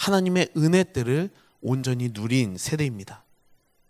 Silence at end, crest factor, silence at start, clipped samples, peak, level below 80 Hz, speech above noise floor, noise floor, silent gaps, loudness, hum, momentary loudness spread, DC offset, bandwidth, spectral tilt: 0.7 s; 18 dB; 0 s; under 0.1%; -6 dBFS; -56 dBFS; 37 dB; -61 dBFS; none; -25 LUFS; none; 13 LU; under 0.1%; 16 kHz; -5.5 dB/octave